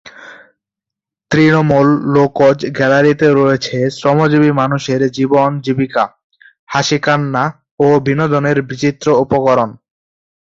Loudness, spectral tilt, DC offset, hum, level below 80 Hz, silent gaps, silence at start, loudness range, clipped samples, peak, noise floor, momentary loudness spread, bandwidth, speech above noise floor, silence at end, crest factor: -13 LUFS; -6.5 dB/octave; under 0.1%; none; -50 dBFS; 6.24-6.30 s, 6.59-6.67 s, 7.71-7.78 s; 0.05 s; 3 LU; under 0.1%; 0 dBFS; -84 dBFS; 7 LU; 7.8 kHz; 72 dB; 0.65 s; 14 dB